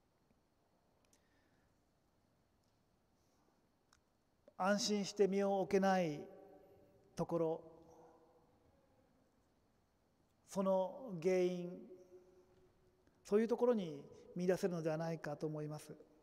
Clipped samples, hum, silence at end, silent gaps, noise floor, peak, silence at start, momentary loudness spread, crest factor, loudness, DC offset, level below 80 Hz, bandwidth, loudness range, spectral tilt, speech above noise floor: under 0.1%; none; 0.25 s; none; -78 dBFS; -22 dBFS; 4.6 s; 16 LU; 20 dB; -39 LUFS; under 0.1%; -78 dBFS; 16 kHz; 9 LU; -5.5 dB/octave; 40 dB